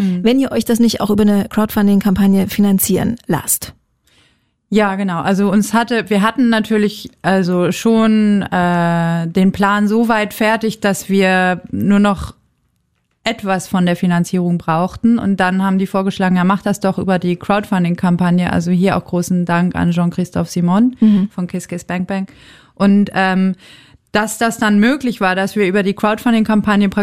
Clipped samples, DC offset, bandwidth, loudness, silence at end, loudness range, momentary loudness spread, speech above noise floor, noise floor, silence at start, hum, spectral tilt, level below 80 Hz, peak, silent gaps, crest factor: under 0.1%; under 0.1%; 15.5 kHz; -15 LUFS; 0 s; 3 LU; 6 LU; 50 dB; -64 dBFS; 0 s; none; -6 dB/octave; -44 dBFS; -2 dBFS; none; 12 dB